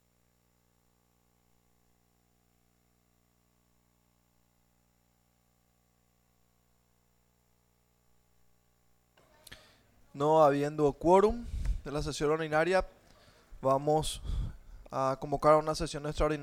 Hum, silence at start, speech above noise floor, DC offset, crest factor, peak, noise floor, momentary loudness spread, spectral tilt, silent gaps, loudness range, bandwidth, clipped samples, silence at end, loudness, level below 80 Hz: 60 Hz at -70 dBFS; 9.5 s; 43 dB; under 0.1%; 22 dB; -10 dBFS; -71 dBFS; 14 LU; -5.5 dB/octave; none; 4 LU; 15.5 kHz; under 0.1%; 0 s; -29 LUFS; -46 dBFS